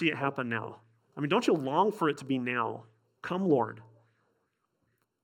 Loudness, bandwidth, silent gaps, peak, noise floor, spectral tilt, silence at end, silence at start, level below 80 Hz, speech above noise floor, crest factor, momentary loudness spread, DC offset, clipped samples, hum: -30 LUFS; 16.5 kHz; none; -12 dBFS; -78 dBFS; -6 dB/octave; 1.4 s; 0 s; -82 dBFS; 48 dB; 20 dB; 18 LU; under 0.1%; under 0.1%; none